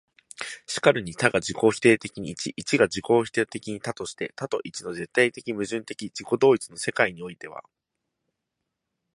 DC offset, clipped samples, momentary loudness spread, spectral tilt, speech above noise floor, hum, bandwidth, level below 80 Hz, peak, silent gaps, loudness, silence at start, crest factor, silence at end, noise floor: under 0.1%; under 0.1%; 15 LU; -4.5 dB/octave; 57 dB; none; 11.5 kHz; -62 dBFS; 0 dBFS; none; -25 LUFS; 0.4 s; 26 dB; 1.55 s; -82 dBFS